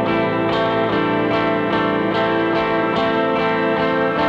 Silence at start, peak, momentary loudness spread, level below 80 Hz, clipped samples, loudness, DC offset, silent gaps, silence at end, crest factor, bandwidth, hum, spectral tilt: 0 s; -6 dBFS; 1 LU; -48 dBFS; under 0.1%; -18 LUFS; under 0.1%; none; 0 s; 12 dB; 7.8 kHz; none; -7.5 dB/octave